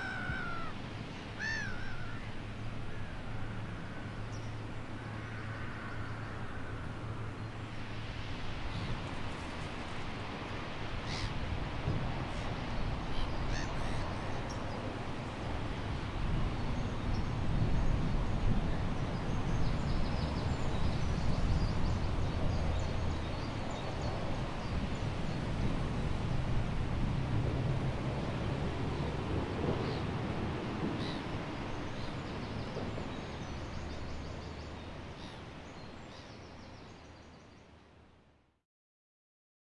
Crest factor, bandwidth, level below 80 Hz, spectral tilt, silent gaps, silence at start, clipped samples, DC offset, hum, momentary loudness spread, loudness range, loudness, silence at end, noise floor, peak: 18 dB; 11 kHz; -42 dBFS; -6.5 dB/octave; none; 0 s; under 0.1%; under 0.1%; none; 9 LU; 8 LU; -38 LUFS; 1.55 s; -66 dBFS; -18 dBFS